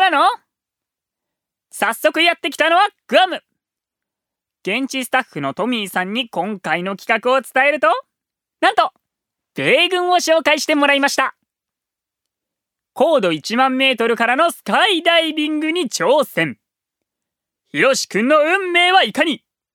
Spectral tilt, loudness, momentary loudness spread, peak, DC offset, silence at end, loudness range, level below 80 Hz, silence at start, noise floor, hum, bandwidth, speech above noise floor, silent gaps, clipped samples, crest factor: -3 dB/octave; -16 LUFS; 8 LU; 0 dBFS; under 0.1%; 0.35 s; 4 LU; -74 dBFS; 0 s; -85 dBFS; none; 18.5 kHz; 69 dB; none; under 0.1%; 18 dB